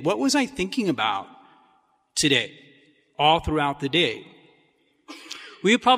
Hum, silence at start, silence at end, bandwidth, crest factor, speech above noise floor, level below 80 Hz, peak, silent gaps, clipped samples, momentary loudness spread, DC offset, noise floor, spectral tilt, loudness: none; 0 s; 0 s; 15.5 kHz; 20 dB; 42 dB; -48 dBFS; -4 dBFS; none; under 0.1%; 18 LU; under 0.1%; -64 dBFS; -3.5 dB/octave; -23 LUFS